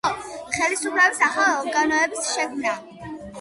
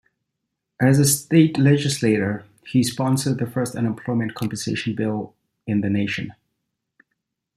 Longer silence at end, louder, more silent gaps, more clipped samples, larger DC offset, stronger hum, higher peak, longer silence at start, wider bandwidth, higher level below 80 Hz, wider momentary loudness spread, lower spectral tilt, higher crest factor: second, 0 s vs 1.25 s; about the same, -21 LUFS vs -21 LUFS; neither; neither; neither; neither; about the same, -6 dBFS vs -4 dBFS; second, 0.05 s vs 0.8 s; second, 11.5 kHz vs 15 kHz; about the same, -58 dBFS vs -60 dBFS; first, 15 LU vs 11 LU; second, -1.5 dB/octave vs -5.5 dB/octave; about the same, 18 dB vs 18 dB